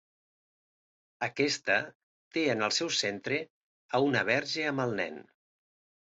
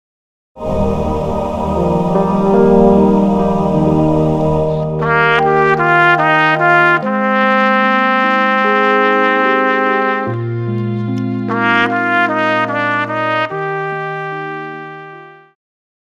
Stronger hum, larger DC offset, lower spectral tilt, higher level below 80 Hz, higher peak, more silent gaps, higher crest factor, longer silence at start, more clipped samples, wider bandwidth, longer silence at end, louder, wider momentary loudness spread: neither; neither; second, -3.5 dB/octave vs -7.5 dB/octave; second, -74 dBFS vs -36 dBFS; second, -12 dBFS vs 0 dBFS; first, 1.95-2.31 s, 3.50-3.89 s vs none; first, 20 dB vs 14 dB; first, 1.2 s vs 0.55 s; neither; about the same, 8.2 kHz vs 9 kHz; first, 0.9 s vs 0.75 s; second, -30 LUFS vs -13 LUFS; about the same, 10 LU vs 10 LU